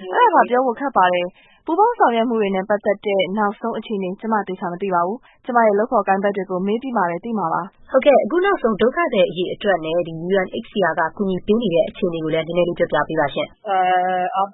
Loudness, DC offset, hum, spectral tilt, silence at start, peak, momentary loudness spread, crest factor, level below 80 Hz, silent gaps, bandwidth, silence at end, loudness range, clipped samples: -19 LUFS; under 0.1%; none; -11 dB/octave; 0 s; -2 dBFS; 8 LU; 18 dB; -52 dBFS; none; 4 kHz; 0 s; 2 LU; under 0.1%